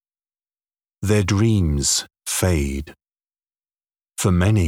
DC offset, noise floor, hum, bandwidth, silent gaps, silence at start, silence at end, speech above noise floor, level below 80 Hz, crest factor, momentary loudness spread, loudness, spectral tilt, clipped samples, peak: under 0.1%; under -90 dBFS; none; 16.5 kHz; none; 1 s; 0 s; over 72 dB; -34 dBFS; 16 dB; 12 LU; -20 LUFS; -5 dB/octave; under 0.1%; -4 dBFS